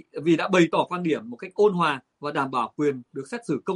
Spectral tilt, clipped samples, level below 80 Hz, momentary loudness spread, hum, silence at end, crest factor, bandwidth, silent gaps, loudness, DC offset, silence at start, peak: -6 dB/octave; under 0.1%; -70 dBFS; 13 LU; none; 0 s; 18 dB; 11 kHz; none; -24 LUFS; under 0.1%; 0.15 s; -6 dBFS